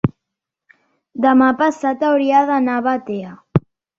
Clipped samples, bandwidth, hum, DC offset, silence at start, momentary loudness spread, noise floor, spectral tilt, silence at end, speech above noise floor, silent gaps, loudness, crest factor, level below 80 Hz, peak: under 0.1%; 7.6 kHz; none; under 0.1%; 0.05 s; 11 LU; -82 dBFS; -7.5 dB/octave; 0.4 s; 66 dB; none; -17 LUFS; 18 dB; -50 dBFS; 0 dBFS